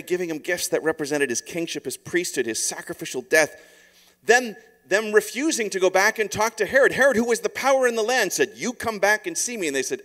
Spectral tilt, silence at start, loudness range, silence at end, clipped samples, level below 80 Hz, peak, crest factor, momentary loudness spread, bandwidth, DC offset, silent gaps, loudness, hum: -2.5 dB/octave; 0.05 s; 5 LU; 0 s; under 0.1%; -62 dBFS; -2 dBFS; 20 dB; 9 LU; 16 kHz; under 0.1%; none; -22 LUFS; none